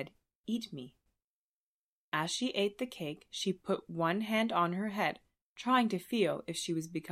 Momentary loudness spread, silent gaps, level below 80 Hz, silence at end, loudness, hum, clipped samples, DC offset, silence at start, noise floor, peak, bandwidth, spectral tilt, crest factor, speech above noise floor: 13 LU; 0.35-0.44 s, 1.24-2.12 s, 5.41-5.56 s; -76 dBFS; 0 s; -34 LUFS; none; under 0.1%; under 0.1%; 0 s; under -90 dBFS; -16 dBFS; 15 kHz; -4.5 dB/octave; 20 dB; over 56 dB